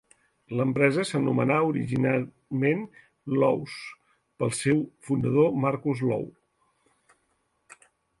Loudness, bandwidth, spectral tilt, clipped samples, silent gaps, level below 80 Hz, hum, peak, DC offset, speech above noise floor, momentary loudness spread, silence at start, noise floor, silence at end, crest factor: -26 LUFS; 11.5 kHz; -6.5 dB/octave; under 0.1%; none; -62 dBFS; none; -8 dBFS; under 0.1%; 47 dB; 12 LU; 0.5 s; -73 dBFS; 1.9 s; 20 dB